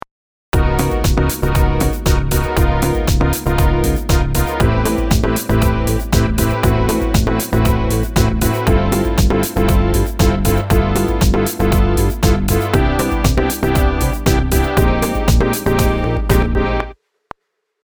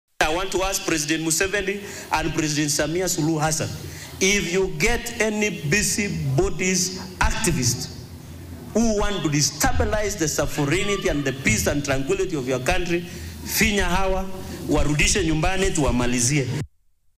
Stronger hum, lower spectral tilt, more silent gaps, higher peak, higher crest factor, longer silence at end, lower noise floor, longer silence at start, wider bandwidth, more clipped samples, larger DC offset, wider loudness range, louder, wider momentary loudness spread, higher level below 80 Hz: neither; first, -6 dB/octave vs -3.5 dB/octave; neither; first, 0 dBFS vs -8 dBFS; about the same, 14 dB vs 14 dB; first, 0.9 s vs 0.5 s; first, -67 dBFS vs -59 dBFS; first, 0.55 s vs 0.2 s; first, over 20 kHz vs 16 kHz; neither; neither; about the same, 1 LU vs 2 LU; first, -16 LUFS vs -22 LUFS; second, 2 LU vs 9 LU; first, -18 dBFS vs -32 dBFS